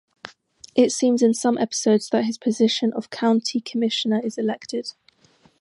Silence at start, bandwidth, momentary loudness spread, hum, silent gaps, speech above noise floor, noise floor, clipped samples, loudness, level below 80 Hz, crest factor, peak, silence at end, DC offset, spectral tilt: 0.25 s; 11.5 kHz; 12 LU; none; none; 37 dB; -58 dBFS; under 0.1%; -22 LUFS; -74 dBFS; 18 dB; -4 dBFS; 0.7 s; under 0.1%; -4 dB/octave